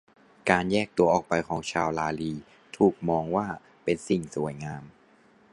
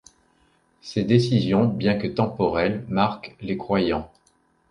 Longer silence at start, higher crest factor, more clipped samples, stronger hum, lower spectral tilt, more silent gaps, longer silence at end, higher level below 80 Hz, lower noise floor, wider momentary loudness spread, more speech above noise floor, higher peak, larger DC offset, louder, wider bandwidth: second, 0.45 s vs 0.85 s; about the same, 24 dB vs 20 dB; neither; neither; second, -6 dB/octave vs -7.5 dB/octave; neither; about the same, 0.65 s vs 0.65 s; second, -56 dBFS vs -50 dBFS; second, -59 dBFS vs -64 dBFS; about the same, 13 LU vs 11 LU; second, 33 dB vs 42 dB; about the same, -4 dBFS vs -4 dBFS; neither; second, -27 LUFS vs -23 LUFS; about the same, 11.5 kHz vs 10.5 kHz